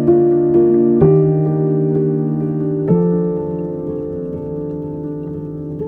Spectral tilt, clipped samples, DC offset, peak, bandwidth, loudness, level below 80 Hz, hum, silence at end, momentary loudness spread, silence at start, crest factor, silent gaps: -13.5 dB/octave; under 0.1%; under 0.1%; -2 dBFS; 2.5 kHz; -16 LUFS; -44 dBFS; none; 0 s; 13 LU; 0 s; 14 dB; none